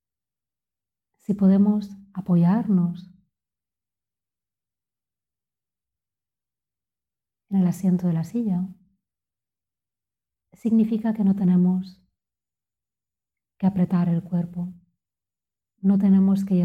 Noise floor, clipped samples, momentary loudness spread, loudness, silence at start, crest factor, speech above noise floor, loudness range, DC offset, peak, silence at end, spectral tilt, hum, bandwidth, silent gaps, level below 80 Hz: under -90 dBFS; under 0.1%; 15 LU; -22 LUFS; 1.3 s; 16 dB; over 69 dB; 5 LU; under 0.1%; -8 dBFS; 0 s; -10 dB/octave; none; 7.8 kHz; none; -64 dBFS